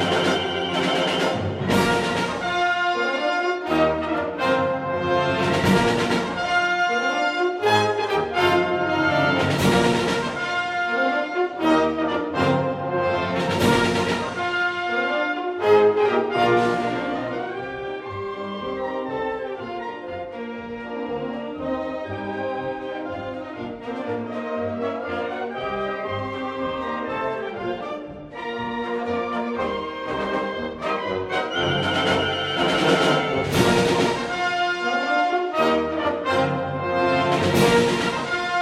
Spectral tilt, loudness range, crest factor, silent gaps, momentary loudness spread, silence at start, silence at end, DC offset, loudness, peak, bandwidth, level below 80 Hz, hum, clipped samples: -5 dB/octave; 9 LU; 18 dB; none; 11 LU; 0 s; 0 s; under 0.1%; -22 LUFS; -4 dBFS; 16 kHz; -50 dBFS; none; under 0.1%